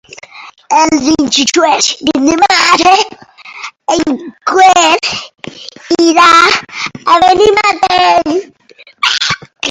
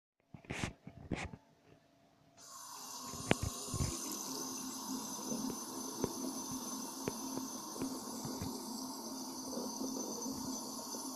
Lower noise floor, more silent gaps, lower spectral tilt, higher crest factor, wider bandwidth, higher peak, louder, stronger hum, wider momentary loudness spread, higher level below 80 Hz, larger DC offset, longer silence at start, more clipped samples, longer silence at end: second, -34 dBFS vs -68 dBFS; neither; second, -2 dB/octave vs -3.5 dB/octave; second, 10 dB vs 32 dB; second, 13 kHz vs 15 kHz; first, 0 dBFS vs -12 dBFS; first, -9 LUFS vs -41 LUFS; neither; first, 15 LU vs 8 LU; first, -46 dBFS vs -60 dBFS; neither; about the same, 0.35 s vs 0.35 s; first, 0.5% vs under 0.1%; about the same, 0 s vs 0 s